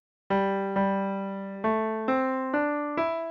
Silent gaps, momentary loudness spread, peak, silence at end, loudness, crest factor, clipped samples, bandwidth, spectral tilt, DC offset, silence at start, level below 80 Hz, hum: none; 4 LU; -14 dBFS; 0 s; -28 LUFS; 14 dB; under 0.1%; 6.2 kHz; -8.5 dB/octave; under 0.1%; 0.3 s; -64 dBFS; none